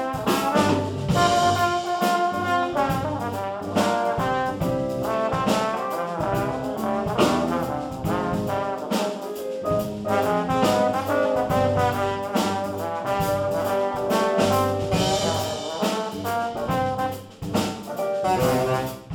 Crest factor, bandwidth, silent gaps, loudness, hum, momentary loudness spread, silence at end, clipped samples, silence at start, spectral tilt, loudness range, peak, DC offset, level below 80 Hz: 18 dB; 19 kHz; none; -24 LUFS; none; 7 LU; 0 s; under 0.1%; 0 s; -5 dB/octave; 3 LU; -6 dBFS; under 0.1%; -48 dBFS